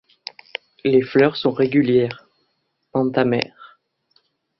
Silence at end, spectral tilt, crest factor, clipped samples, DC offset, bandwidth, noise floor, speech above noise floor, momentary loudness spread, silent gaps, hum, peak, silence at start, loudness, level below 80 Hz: 0.95 s; -8 dB/octave; 20 dB; under 0.1%; under 0.1%; 6 kHz; -71 dBFS; 53 dB; 17 LU; none; none; -2 dBFS; 0.85 s; -19 LUFS; -60 dBFS